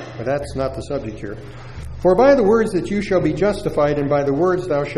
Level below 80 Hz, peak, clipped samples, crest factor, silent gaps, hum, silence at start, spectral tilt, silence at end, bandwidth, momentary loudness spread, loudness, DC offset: -38 dBFS; -2 dBFS; under 0.1%; 16 dB; none; none; 0 s; -7 dB/octave; 0 s; 12 kHz; 19 LU; -18 LUFS; under 0.1%